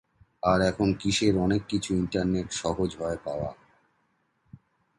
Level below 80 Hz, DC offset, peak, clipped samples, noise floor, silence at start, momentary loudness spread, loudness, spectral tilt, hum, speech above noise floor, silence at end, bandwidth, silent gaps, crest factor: -48 dBFS; under 0.1%; -10 dBFS; under 0.1%; -72 dBFS; 0.45 s; 9 LU; -27 LUFS; -5.5 dB/octave; none; 46 dB; 1.45 s; 11.5 kHz; none; 18 dB